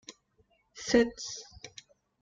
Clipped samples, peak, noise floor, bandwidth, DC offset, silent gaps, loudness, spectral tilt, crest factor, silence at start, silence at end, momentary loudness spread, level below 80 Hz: under 0.1%; -12 dBFS; -70 dBFS; 9 kHz; under 0.1%; none; -30 LUFS; -3 dB/octave; 22 dB; 0.1 s; 0.55 s; 24 LU; -60 dBFS